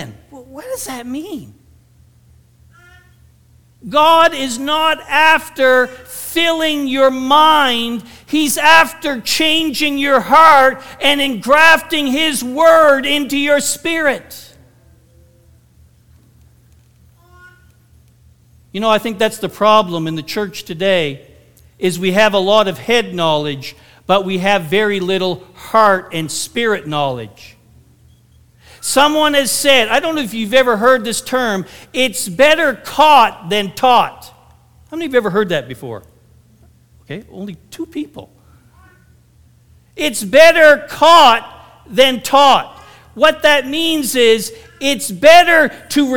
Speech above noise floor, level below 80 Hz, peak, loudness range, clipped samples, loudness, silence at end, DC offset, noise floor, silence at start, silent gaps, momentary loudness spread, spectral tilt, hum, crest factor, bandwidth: 36 dB; -50 dBFS; 0 dBFS; 12 LU; 0.2%; -12 LUFS; 0 s; 1%; -49 dBFS; 0 s; none; 18 LU; -3 dB/octave; none; 14 dB; 19.5 kHz